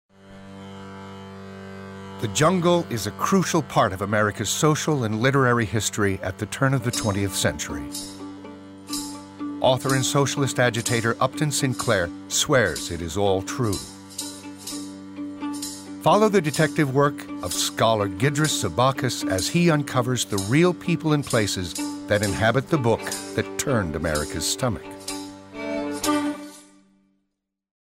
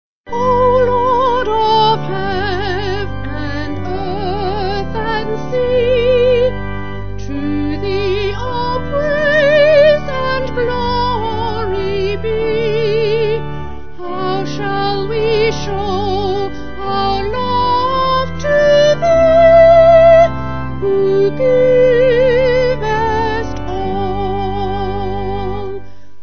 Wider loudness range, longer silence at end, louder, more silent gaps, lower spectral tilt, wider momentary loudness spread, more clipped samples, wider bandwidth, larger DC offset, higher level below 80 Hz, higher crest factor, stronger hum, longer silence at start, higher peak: second, 5 LU vs 8 LU; first, 1.3 s vs 0.35 s; second, -23 LUFS vs -14 LUFS; neither; second, -4.5 dB/octave vs -6.5 dB/octave; first, 16 LU vs 12 LU; neither; first, 16 kHz vs 6.6 kHz; second, under 0.1% vs 6%; second, -50 dBFS vs -30 dBFS; about the same, 16 dB vs 14 dB; neither; first, 0.25 s vs 0.05 s; second, -8 dBFS vs 0 dBFS